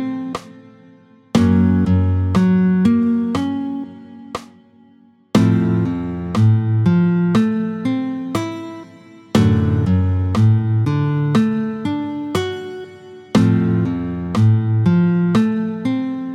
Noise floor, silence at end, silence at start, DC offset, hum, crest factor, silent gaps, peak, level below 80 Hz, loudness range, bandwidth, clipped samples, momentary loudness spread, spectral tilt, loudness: -50 dBFS; 0 s; 0 s; under 0.1%; none; 16 dB; none; 0 dBFS; -44 dBFS; 3 LU; 11 kHz; under 0.1%; 14 LU; -8 dB/octave; -17 LUFS